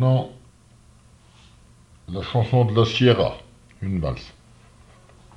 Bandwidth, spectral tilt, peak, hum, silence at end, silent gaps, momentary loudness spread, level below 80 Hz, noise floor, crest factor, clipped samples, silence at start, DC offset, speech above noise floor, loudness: 7.6 kHz; -7.5 dB/octave; -6 dBFS; none; 1.05 s; none; 18 LU; -46 dBFS; -52 dBFS; 18 dB; under 0.1%; 0 s; under 0.1%; 32 dB; -22 LUFS